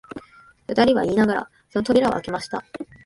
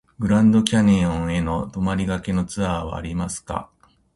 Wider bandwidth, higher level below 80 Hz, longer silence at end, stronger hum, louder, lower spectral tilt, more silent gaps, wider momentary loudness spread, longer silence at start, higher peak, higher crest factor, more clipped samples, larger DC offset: about the same, 11.5 kHz vs 11.5 kHz; second, -52 dBFS vs -38 dBFS; second, 0.2 s vs 0.5 s; neither; about the same, -21 LUFS vs -21 LUFS; about the same, -6 dB/octave vs -6 dB/octave; neither; first, 20 LU vs 12 LU; about the same, 0.15 s vs 0.2 s; about the same, -4 dBFS vs -2 dBFS; about the same, 20 dB vs 20 dB; neither; neither